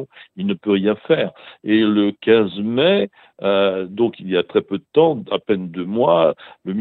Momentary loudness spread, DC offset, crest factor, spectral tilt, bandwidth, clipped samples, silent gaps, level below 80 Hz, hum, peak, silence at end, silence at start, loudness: 10 LU; under 0.1%; 16 dB; -9.5 dB/octave; 4.4 kHz; under 0.1%; none; -62 dBFS; none; -2 dBFS; 0 s; 0 s; -18 LUFS